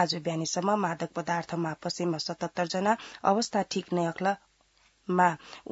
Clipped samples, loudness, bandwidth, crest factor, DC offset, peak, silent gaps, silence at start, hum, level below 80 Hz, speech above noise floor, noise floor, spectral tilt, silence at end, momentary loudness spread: under 0.1%; -29 LUFS; 8 kHz; 20 dB; under 0.1%; -8 dBFS; none; 0 s; none; -70 dBFS; 37 dB; -66 dBFS; -4.5 dB/octave; 0 s; 7 LU